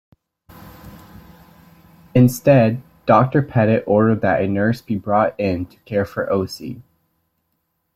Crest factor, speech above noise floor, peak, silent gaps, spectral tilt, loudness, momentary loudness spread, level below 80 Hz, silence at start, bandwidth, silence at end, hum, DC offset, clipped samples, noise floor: 18 dB; 54 dB; -2 dBFS; none; -7.5 dB/octave; -18 LUFS; 12 LU; -52 dBFS; 0.65 s; 14.5 kHz; 1.15 s; none; under 0.1%; under 0.1%; -71 dBFS